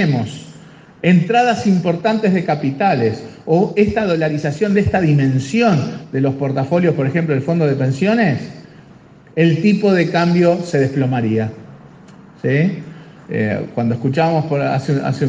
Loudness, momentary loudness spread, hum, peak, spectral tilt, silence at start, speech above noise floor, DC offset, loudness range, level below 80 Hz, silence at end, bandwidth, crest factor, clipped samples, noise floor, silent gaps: -16 LUFS; 7 LU; none; -2 dBFS; -7.5 dB/octave; 0 s; 28 dB; under 0.1%; 4 LU; -50 dBFS; 0 s; 9 kHz; 16 dB; under 0.1%; -43 dBFS; none